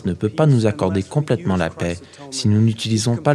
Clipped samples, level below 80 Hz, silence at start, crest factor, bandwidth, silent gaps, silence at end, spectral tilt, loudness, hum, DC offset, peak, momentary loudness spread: under 0.1%; -50 dBFS; 0.05 s; 18 dB; 12 kHz; none; 0 s; -6 dB/octave; -19 LUFS; none; under 0.1%; 0 dBFS; 10 LU